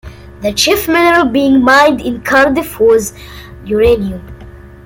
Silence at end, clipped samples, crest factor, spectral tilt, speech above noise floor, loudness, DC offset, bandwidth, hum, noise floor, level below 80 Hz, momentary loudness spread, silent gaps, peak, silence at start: 0.25 s; under 0.1%; 12 dB; -4 dB/octave; 22 dB; -11 LUFS; under 0.1%; 17 kHz; none; -33 dBFS; -34 dBFS; 16 LU; none; 0 dBFS; 0.05 s